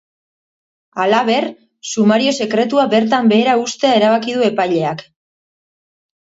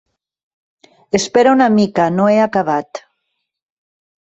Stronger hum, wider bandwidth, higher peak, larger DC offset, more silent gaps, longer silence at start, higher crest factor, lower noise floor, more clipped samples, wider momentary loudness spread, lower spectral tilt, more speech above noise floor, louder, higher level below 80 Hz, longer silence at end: neither; about the same, 8 kHz vs 8.2 kHz; about the same, 0 dBFS vs -2 dBFS; neither; neither; second, 0.95 s vs 1.15 s; about the same, 16 dB vs 16 dB; first, under -90 dBFS vs -73 dBFS; neither; about the same, 11 LU vs 10 LU; about the same, -4.5 dB/octave vs -5.5 dB/octave; first, over 76 dB vs 60 dB; about the same, -15 LUFS vs -14 LUFS; second, -64 dBFS vs -56 dBFS; about the same, 1.35 s vs 1.25 s